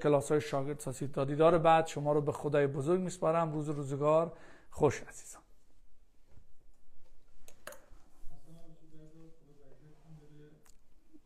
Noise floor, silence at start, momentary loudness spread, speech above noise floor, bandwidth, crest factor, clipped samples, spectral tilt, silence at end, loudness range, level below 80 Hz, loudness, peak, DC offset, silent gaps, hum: -54 dBFS; 0 s; 24 LU; 23 dB; 15.5 kHz; 20 dB; under 0.1%; -6.5 dB/octave; 0.05 s; 11 LU; -58 dBFS; -31 LUFS; -14 dBFS; under 0.1%; none; none